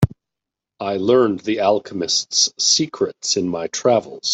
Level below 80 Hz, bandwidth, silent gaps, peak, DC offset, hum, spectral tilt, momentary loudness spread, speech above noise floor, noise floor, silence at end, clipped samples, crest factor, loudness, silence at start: -48 dBFS; 8.4 kHz; none; -2 dBFS; under 0.1%; none; -3.5 dB/octave; 7 LU; 66 dB; -85 dBFS; 0 s; under 0.1%; 16 dB; -18 LUFS; 0 s